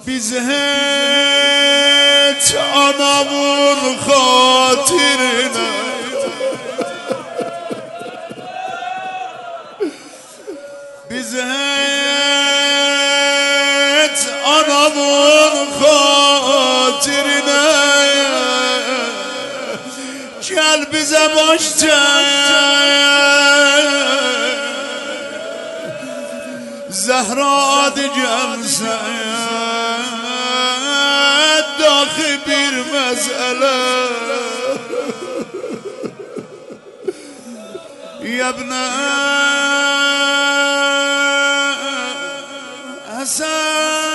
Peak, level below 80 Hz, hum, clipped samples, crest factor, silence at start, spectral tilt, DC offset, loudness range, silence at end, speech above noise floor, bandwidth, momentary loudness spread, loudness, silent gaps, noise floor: 0 dBFS; -60 dBFS; none; under 0.1%; 16 dB; 0 s; -0.5 dB/octave; under 0.1%; 13 LU; 0 s; 23 dB; 12 kHz; 18 LU; -13 LUFS; none; -37 dBFS